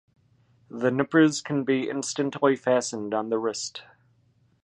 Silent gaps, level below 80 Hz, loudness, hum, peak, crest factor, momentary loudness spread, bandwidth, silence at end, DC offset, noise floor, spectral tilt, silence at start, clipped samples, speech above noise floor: none; -72 dBFS; -25 LUFS; 60 Hz at -55 dBFS; -6 dBFS; 20 dB; 11 LU; 11 kHz; 0.8 s; under 0.1%; -64 dBFS; -4.5 dB/octave; 0.7 s; under 0.1%; 40 dB